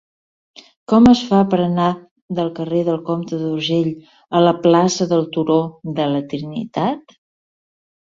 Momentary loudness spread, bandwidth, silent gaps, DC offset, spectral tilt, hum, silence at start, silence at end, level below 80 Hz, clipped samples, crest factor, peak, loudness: 12 LU; 7.6 kHz; 2.11-2.16 s, 2.22-2.28 s; under 0.1%; -6.5 dB/octave; none; 0.9 s; 1.1 s; -48 dBFS; under 0.1%; 16 dB; -2 dBFS; -17 LUFS